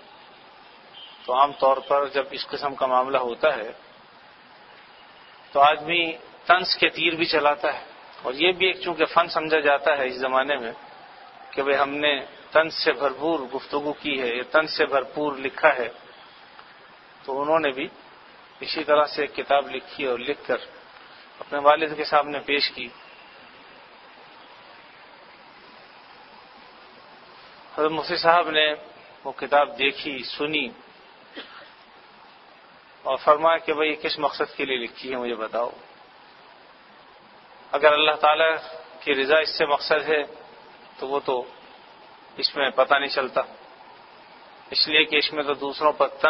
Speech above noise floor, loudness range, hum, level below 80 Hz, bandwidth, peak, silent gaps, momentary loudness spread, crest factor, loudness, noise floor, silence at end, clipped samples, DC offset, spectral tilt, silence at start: 28 dB; 6 LU; none; -66 dBFS; 6 kHz; -2 dBFS; none; 15 LU; 24 dB; -23 LUFS; -50 dBFS; 0 s; under 0.1%; under 0.1%; -6 dB/octave; 0.95 s